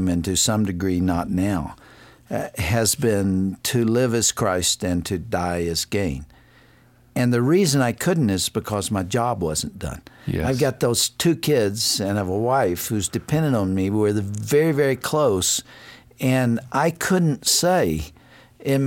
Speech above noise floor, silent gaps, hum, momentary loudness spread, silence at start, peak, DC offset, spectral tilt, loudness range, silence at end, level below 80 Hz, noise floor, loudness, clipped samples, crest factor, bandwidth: 32 dB; none; none; 8 LU; 0 s; -6 dBFS; under 0.1%; -4.5 dB/octave; 2 LU; 0 s; -44 dBFS; -53 dBFS; -21 LUFS; under 0.1%; 16 dB; 17 kHz